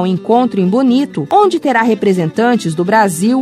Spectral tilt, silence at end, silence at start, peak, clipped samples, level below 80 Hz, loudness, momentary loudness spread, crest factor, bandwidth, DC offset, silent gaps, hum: -6 dB/octave; 0 s; 0 s; 0 dBFS; under 0.1%; -58 dBFS; -12 LUFS; 2 LU; 12 dB; 15 kHz; under 0.1%; none; none